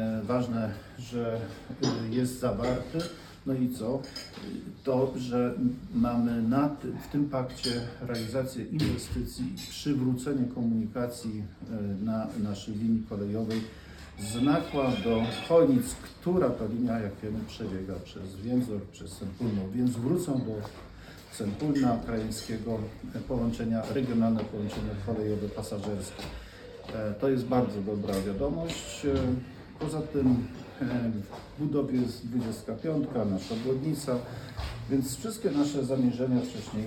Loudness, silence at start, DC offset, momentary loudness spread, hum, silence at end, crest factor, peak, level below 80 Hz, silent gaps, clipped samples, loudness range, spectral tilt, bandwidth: -31 LUFS; 0 s; under 0.1%; 12 LU; none; 0 s; 18 dB; -12 dBFS; -50 dBFS; none; under 0.1%; 4 LU; -6.5 dB/octave; 17.5 kHz